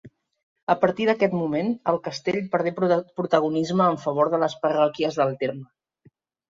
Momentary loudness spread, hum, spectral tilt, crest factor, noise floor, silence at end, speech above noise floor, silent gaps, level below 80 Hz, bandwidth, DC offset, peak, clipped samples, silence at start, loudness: 5 LU; none; -6.5 dB/octave; 18 dB; -60 dBFS; 0.85 s; 37 dB; 0.43-0.56 s, 0.63-0.67 s; -66 dBFS; 7.6 kHz; under 0.1%; -6 dBFS; under 0.1%; 0.05 s; -23 LUFS